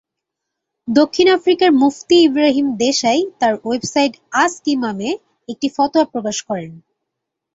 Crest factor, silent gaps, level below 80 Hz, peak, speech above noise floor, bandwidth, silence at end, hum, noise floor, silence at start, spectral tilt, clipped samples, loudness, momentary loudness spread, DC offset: 16 dB; none; -60 dBFS; -2 dBFS; 64 dB; 8 kHz; 0.8 s; none; -80 dBFS; 0.85 s; -3.5 dB/octave; under 0.1%; -16 LUFS; 11 LU; under 0.1%